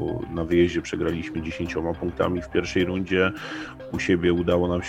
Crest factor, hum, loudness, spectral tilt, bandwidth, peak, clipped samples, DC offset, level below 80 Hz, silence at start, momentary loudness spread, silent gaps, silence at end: 18 dB; none; -25 LUFS; -6.5 dB/octave; 8.8 kHz; -6 dBFS; under 0.1%; under 0.1%; -44 dBFS; 0 s; 9 LU; none; 0 s